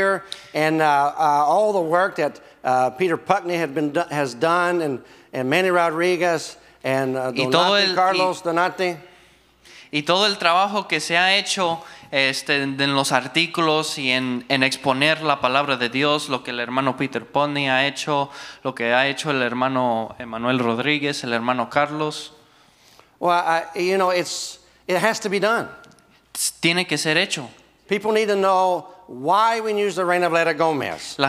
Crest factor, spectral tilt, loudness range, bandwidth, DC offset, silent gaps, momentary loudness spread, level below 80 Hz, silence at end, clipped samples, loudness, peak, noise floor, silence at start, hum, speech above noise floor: 22 dB; -3.5 dB/octave; 3 LU; 16 kHz; under 0.1%; none; 9 LU; -66 dBFS; 0 s; under 0.1%; -20 LUFS; 0 dBFS; -54 dBFS; 0 s; none; 33 dB